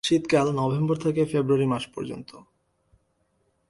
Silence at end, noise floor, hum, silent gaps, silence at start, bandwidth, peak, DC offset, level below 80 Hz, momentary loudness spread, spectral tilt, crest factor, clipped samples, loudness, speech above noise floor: 1.3 s; -70 dBFS; none; none; 0.05 s; 11.5 kHz; -8 dBFS; under 0.1%; -60 dBFS; 14 LU; -6.5 dB/octave; 18 dB; under 0.1%; -24 LUFS; 46 dB